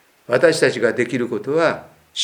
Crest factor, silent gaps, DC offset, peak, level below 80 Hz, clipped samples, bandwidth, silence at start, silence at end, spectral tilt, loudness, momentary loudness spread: 18 dB; none; under 0.1%; 0 dBFS; -66 dBFS; under 0.1%; 18.5 kHz; 0.3 s; 0 s; -4 dB/octave; -18 LUFS; 9 LU